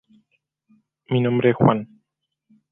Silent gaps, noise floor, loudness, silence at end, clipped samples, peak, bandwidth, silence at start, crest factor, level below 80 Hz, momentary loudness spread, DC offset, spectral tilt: none; -78 dBFS; -20 LUFS; 0.85 s; under 0.1%; -2 dBFS; 3.8 kHz; 1.1 s; 20 dB; -58 dBFS; 10 LU; under 0.1%; -11 dB/octave